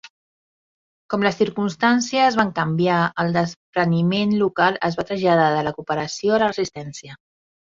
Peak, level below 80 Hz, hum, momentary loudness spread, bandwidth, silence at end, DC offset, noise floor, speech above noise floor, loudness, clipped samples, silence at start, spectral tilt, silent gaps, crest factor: -2 dBFS; -58 dBFS; none; 8 LU; 7.6 kHz; 0.6 s; under 0.1%; under -90 dBFS; over 70 dB; -20 LUFS; under 0.1%; 0.05 s; -5.5 dB/octave; 0.10-1.09 s, 3.56-3.73 s; 18 dB